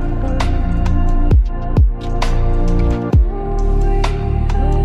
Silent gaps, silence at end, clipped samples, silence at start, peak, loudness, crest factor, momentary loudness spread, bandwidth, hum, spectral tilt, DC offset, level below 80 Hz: none; 0 s; under 0.1%; 0 s; -4 dBFS; -18 LUFS; 8 dB; 4 LU; 7.8 kHz; none; -7.5 dB/octave; under 0.1%; -14 dBFS